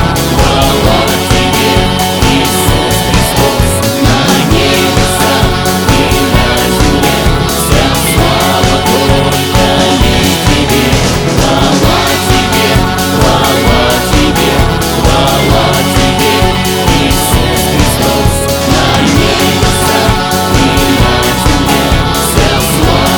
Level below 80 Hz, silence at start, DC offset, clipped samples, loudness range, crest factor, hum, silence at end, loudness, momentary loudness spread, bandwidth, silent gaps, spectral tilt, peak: -18 dBFS; 0 s; under 0.1%; 0.6%; 0 LU; 8 dB; none; 0 s; -8 LUFS; 2 LU; over 20 kHz; none; -4 dB/octave; 0 dBFS